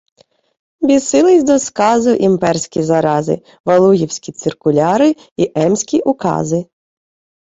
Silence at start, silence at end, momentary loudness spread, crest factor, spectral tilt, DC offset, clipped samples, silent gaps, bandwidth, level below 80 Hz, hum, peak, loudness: 0.8 s; 0.85 s; 9 LU; 14 dB; -5.5 dB/octave; under 0.1%; under 0.1%; 3.60-3.64 s, 5.31-5.36 s; 8 kHz; -52 dBFS; none; 0 dBFS; -14 LUFS